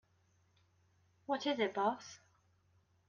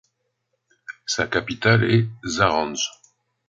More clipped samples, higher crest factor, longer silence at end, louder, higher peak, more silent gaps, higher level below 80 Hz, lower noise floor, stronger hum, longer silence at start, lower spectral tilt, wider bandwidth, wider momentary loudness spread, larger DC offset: neither; about the same, 22 dB vs 20 dB; first, 0.9 s vs 0.6 s; second, -37 LUFS vs -21 LUFS; second, -20 dBFS vs -2 dBFS; neither; second, -86 dBFS vs -50 dBFS; about the same, -74 dBFS vs -74 dBFS; neither; first, 1.3 s vs 0.9 s; about the same, -4 dB/octave vs -4.5 dB/octave; about the same, 7.4 kHz vs 7.8 kHz; first, 19 LU vs 10 LU; neither